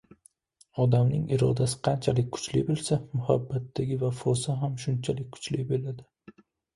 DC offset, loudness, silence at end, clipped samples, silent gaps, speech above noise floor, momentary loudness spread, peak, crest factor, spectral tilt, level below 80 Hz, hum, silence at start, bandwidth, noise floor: under 0.1%; -28 LUFS; 0.7 s; under 0.1%; none; 36 dB; 8 LU; -8 dBFS; 20 dB; -6.5 dB/octave; -56 dBFS; none; 0.75 s; 11.5 kHz; -63 dBFS